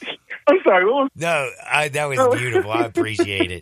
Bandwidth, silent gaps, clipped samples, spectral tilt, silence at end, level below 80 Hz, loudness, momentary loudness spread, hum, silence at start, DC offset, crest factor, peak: 15.5 kHz; none; under 0.1%; -4.5 dB/octave; 0 s; -62 dBFS; -19 LUFS; 6 LU; none; 0 s; under 0.1%; 16 dB; -2 dBFS